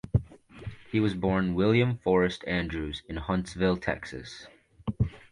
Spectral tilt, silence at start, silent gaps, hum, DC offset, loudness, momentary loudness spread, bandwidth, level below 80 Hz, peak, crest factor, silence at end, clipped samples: -7 dB/octave; 0.05 s; none; none; under 0.1%; -28 LUFS; 17 LU; 11 kHz; -44 dBFS; -12 dBFS; 18 dB; 0.1 s; under 0.1%